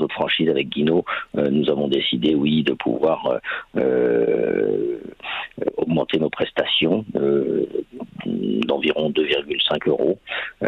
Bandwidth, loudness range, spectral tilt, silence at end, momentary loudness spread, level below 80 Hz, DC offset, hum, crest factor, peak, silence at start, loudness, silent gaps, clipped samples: 6.4 kHz; 2 LU; -7.5 dB/octave; 0 s; 8 LU; -56 dBFS; under 0.1%; none; 14 dB; -6 dBFS; 0 s; -21 LUFS; none; under 0.1%